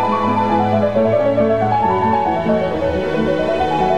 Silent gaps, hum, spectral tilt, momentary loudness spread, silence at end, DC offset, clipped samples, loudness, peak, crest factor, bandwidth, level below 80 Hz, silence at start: none; none; -7.5 dB/octave; 3 LU; 0 s; 1%; under 0.1%; -16 LUFS; -4 dBFS; 12 dB; 9.6 kHz; -40 dBFS; 0 s